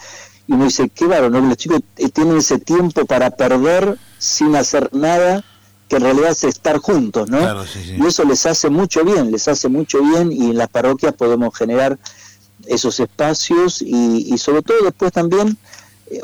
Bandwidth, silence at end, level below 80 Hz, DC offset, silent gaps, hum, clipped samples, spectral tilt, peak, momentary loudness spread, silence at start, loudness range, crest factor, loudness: 20 kHz; 0 s; -48 dBFS; under 0.1%; none; none; under 0.1%; -4.5 dB/octave; -8 dBFS; 6 LU; 0 s; 2 LU; 6 dB; -15 LUFS